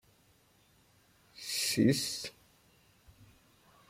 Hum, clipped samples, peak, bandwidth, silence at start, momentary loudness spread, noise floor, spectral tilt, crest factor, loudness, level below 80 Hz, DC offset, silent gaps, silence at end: none; under 0.1%; -14 dBFS; 16.5 kHz; 1.35 s; 17 LU; -67 dBFS; -4 dB/octave; 22 dB; -32 LUFS; -70 dBFS; under 0.1%; none; 1.6 s